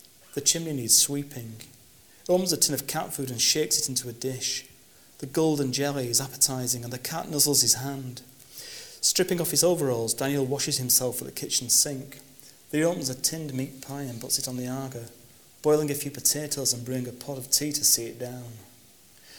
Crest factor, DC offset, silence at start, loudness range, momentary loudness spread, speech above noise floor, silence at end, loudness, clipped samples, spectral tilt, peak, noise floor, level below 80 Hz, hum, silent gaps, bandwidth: 22 dB; under 0.1%; 0.35 s; 4 LU; 17 LU; 28 dB; 0 s; -25 LUFS; under 0.1%; -2.5 dB/octave; -6 dBFS; -55 dBFS; -62 dBFS; none; none; over 20 kHz